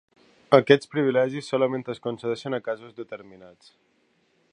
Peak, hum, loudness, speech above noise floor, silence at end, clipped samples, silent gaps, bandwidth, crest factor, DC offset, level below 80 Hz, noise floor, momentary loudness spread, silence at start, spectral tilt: 0 dBFS; none; -24 LUFS; 42 dB; 1.05 s; under 0.1%; none; 10 kHz; 24 dB; under 0.1%; -72 dBFS; -67 dBFS; 20 LU; 0.5 s; -6.5 dB/octave